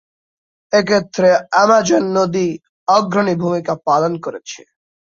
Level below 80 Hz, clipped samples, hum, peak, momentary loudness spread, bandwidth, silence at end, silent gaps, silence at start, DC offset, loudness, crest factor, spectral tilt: -58 dBFS; under 0.1%; none; -2 dBFS; 13 LU; 7.6 kHz; 0.55 s; 2.69-2.86 s; 0.7 s; under 0.1%; -15 LUFS; 16 dB; -5 dB/octave